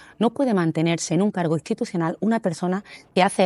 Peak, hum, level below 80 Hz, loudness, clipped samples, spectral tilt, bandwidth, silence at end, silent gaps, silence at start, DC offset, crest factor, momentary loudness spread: -4 dBFS; none; -66 dBFS; -23 LUFS; under 0.1%; -5.5 dB/octave; 12 kHz; 0 s; none; 0.2 s; under 0.1%; 18 dB; 6 LU